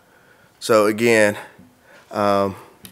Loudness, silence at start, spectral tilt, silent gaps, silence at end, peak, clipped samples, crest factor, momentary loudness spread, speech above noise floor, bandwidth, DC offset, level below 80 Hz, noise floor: -18 LUFS; 0.6 s; -4.5 dB/octave; none; 0.05 s; 0 dBFS; under 0.1%; 20 dB; 16 LU; 35 dB; 16 kHz; under 0.1%; -66 dBFS; -53 dBFS